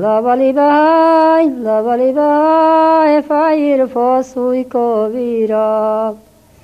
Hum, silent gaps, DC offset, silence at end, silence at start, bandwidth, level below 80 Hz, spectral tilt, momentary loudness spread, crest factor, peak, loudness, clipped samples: none; none; under 0.1%; 0.45 s; 0 s; 9.4 kHz; -56 dBFS; -6.5 dB/octave; 7 LU; 12 dB; 0 dBFS; -12 LUFS; under 0.1%